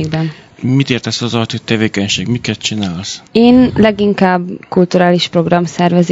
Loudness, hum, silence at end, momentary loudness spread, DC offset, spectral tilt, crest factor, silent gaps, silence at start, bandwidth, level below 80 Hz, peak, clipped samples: -13 LUFS; none; 0 s; 10 LU; under 0.1%; -5.5 dB/octave; 12 dB; none; 0 s; 8 kHz; -44 dBFS; 0 dBFS; 0.4%